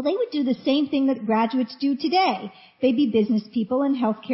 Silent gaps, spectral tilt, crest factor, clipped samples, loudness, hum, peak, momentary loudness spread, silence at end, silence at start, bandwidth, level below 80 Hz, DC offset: none; -9 dB/octave; 14 dB; under 0.1%; -23 LUFS; none; -8 dBFS; 4 LU; 0 s; 0 s; 5.8 kHz; -66 dBFS; under 0.1%